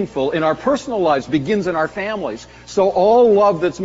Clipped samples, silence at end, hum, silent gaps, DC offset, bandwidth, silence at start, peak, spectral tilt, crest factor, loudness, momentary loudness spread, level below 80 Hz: under 0.1%; 0 s; none; none; under 0.1%; 8 kHz; 0 s; -4 dBFS; -5 dB/octave; 14 dB; -17 LUFS; 12 LU; -48 dBFS